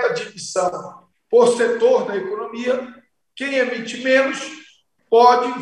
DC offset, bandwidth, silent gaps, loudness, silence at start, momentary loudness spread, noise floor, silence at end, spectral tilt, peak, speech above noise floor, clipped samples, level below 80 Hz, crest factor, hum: under 0.1%; 11 kHz; none; -18 LUFS; 0 s; 15 LU; -53 dBFS; 0 s; -3.5 dB/octave; -2 dBFS; 35 dB; under 0.1%; -70 dBFS; 18 dB; none